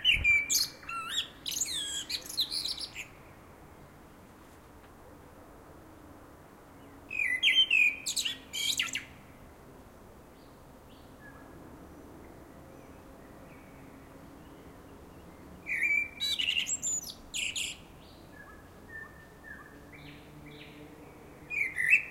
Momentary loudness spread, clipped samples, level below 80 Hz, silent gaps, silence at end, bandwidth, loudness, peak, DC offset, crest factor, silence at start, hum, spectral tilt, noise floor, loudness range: 28 LU; under 0.1%; -58 dBFS; none; 0 s; 16 kHz; -29 LUFS; -12 dBFS; under 0.1%; 24 dB; 0 s; none; 0 dB/octave; -54 dBFS; 24 LU